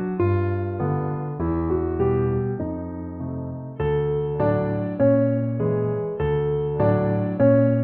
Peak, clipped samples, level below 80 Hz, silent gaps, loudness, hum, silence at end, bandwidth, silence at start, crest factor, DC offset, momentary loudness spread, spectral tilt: -6 dBFS; under 0.1%; -40 dBFS; none; -23 LUFS; none; 0 s; 4.2 kHz; 0 s; 16 dB; under 0.1%; 11 LU; -12.5 dB/octave